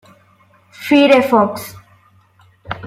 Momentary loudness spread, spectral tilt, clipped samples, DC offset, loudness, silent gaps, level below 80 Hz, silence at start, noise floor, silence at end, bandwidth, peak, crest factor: 20 LU; -5 dB/octave; under 0.1%; under 0.1%; -12 LUFS; none; -54 dBFS; 0.8 s; -52 dBFS; 0 s; 15.5 kHz; -2 dBFS; 16 dB